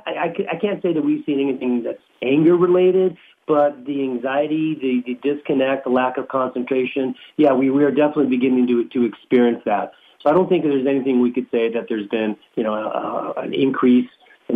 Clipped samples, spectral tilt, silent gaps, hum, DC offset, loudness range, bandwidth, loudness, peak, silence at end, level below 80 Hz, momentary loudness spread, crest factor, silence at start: under 0.1%; -9 dB/octave; none; none; under 0.1%; 3 LU; 3.8 kHz; -19 LUFS; -4 dBFS; 0 s; -68 dBFS; 9 LU; 14 dB; 0.05 s